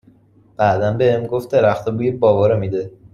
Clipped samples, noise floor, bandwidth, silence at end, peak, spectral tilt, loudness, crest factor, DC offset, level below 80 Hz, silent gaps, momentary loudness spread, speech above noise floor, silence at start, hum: under 0.1%; -51 dBFS; 13 kHz; 0.25 s; -2 dBFS; -8 dB/octave; -17 LUFS; 16 dB; under 0.1%; -50 dBFS; none; 6 LU; 34 dB; 0.6 s; none